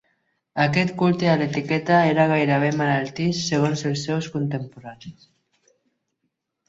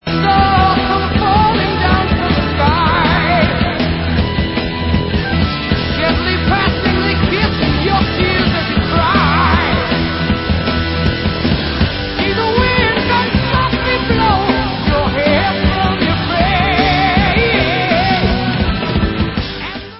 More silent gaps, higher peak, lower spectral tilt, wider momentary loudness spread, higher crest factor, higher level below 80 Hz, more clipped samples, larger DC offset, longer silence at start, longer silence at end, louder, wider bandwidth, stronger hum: neither; second, -4 dBFS vs 0 dBFS; second, -6 dB/octave vs -9.5 dB/octave; first, 13 LU vs 4 LU; about the same, 18 dB vs 14 dB; second, -60 dBFS vs -22 dBFS; neither; second, under 0.1% vs 0.2%; first, 0.55 s vs 0.05 s; first, 1.55 s vs 0 s; second, -21 LUFS vs -14 LUFS; first, 8 kHz vs 5.8 kHz; neither